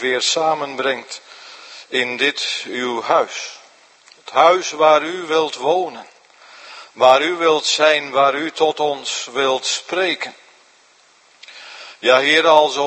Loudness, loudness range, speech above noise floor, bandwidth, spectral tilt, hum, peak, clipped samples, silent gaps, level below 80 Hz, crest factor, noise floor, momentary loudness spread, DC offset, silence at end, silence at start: -17 LUFS; 5 LU; 36 dB; 8.8 kHz; -1.5 dB/octave; none; 0 dBFS; under 0.1%; none; -74 dBFS; 18 dB; -53 dBFS; 22 LU; under 0.1%; 0 s; 0 s